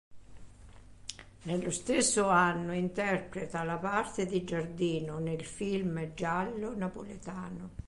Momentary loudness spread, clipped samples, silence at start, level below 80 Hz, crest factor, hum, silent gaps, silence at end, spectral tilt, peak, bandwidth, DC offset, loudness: 16 LU; under 0.1%; 0.1 s; -56 dBFS; 20 dB; none; none; 0 s; -4.5 dB/octave; -14 dBFS; 11.5 kHz; under 0.1%; -32 LUFS